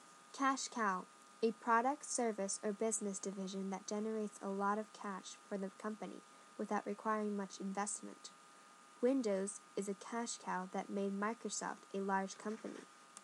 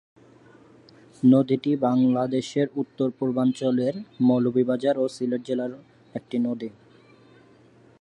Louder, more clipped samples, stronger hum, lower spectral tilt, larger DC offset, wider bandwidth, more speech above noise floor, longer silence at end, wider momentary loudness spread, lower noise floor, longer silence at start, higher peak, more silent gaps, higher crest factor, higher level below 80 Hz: second, -41 LUFS vs -24 LUFS; neither; neither; second, -4 dB/octave vs -7.5 dB/octave; neither; first, 12.5 kHz vs 9.2 kHz; second, 21 dB vs 31 dB; second, 0 s vs 1.3 s; first, 14 LU vs 10 LU; first, -62 dBFS vs -54 dBFS; second, 0 s vs 1.25 s; second, -22 dBFS vs -8 dBFS; neither; about the same, 20 dB vs 18 dB; second, under -90 dBFS vs -70 dBFS